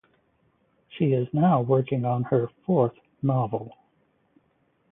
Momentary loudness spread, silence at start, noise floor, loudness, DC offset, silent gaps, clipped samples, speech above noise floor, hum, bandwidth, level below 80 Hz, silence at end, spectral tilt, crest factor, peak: 9 LU; 0.95 s; -68 dBFS; -25 LUFS; under 0.1%; none; under 0.1%; 45 dB; none; 3.8 kHz; -64 dBFS; 1.2 s; -13 dB/octave; 18 dB; -8 dBFS